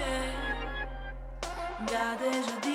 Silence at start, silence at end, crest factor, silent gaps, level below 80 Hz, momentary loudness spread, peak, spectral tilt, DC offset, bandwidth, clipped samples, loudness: 0 s; 0 s; 18 dB; none; -42 dBFS; 10 LU; -16 dBFS; -4 dB/octave; under 0.1%; 16 kHz; under 0.1%; -34 LUFS